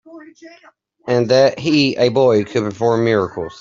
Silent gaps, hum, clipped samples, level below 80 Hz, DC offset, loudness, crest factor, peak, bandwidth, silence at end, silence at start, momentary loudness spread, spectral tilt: none; none; under 0.1%; -56 dBFS; under 0.1%; -16 LUFS; 14 dB; -2 dBFS; 7.6 kHz; 0.05 s; 0.1 s; 7 LU; -6 dB/octave